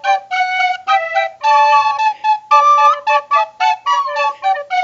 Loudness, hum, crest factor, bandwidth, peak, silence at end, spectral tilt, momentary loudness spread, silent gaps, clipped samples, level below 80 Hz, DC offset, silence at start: -13 LUFS; none; 14 dB; 7.6 kHz; 0 dBFS; 0 s; 1 dB/octave; 7 LU; none; under 0.1%; -72 dBFS; under 0.1%; 0.05 s